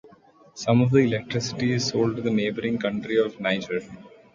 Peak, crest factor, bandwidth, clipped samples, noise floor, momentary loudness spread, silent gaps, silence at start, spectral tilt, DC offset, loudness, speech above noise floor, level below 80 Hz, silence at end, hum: -6 dBFS; 18 dB; 7.6 kHz; under 0.1%; -53 dBFS; 10 LU; none; 0.05 s; -6 dB/octave; under 0.1%; -24 LUFS; 30 dB; -58 dBFS; 0.25 s; none